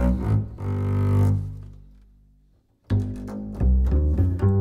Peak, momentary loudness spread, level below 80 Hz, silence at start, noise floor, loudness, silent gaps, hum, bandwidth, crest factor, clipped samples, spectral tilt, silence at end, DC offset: -10 dBFS; 13 LU; -28 dBFS; 0 s; -60 dBFS; -24 LUFS; none; 50 Hz at -40 dBFS; 4.1 kHz; 14 dB; under 0.1%; -10 dB/octave; 0 s; under 0.1%